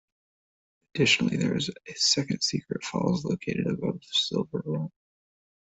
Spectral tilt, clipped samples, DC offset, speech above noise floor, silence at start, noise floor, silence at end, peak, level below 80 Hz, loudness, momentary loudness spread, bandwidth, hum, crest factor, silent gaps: -4 dB/octave; under 0.1%; under 0.1%; over 62 dB; 0.95 s; under -90 dBFS; 0.75 s; -8 dBFS; -62 dBFS; -27 LUFS; 10 LU; 8.2 kHz; none; 20 dB; none